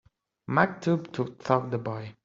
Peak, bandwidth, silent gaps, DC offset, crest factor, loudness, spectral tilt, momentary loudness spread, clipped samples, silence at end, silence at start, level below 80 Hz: -6 dBFS; 7.6 kHz; none; under 0.1%; 24 dB; -28 LUFS; -6 dB/octave; 9 LU; under 0.1%; 0.1 s; 0.5 s; -64 dBFS